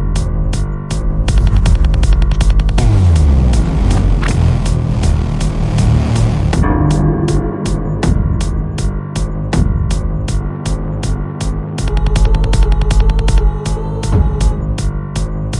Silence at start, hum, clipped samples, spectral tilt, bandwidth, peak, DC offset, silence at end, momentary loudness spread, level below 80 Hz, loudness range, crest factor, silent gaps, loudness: 0 s; none; under 0.1%; -6.5 dB/octave; 11 kHz; 0 dBFS; under 0.1%; 0 s; 7 LU; -14 dBFS; 5 LU; 12 dB; none; -15 LUFS